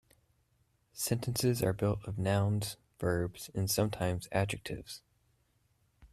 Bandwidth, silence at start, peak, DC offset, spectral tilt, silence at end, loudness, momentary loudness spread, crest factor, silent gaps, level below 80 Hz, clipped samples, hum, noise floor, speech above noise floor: 15.5 kHz; 0.95 s; -16 dBFS; under 0.1%; -5 dB/octave; 0.05 s; -34 LUFS; 11 LU; 18 dB; none; -58 dBFS; under 0.1%; none; -73 dBFS; 41 dB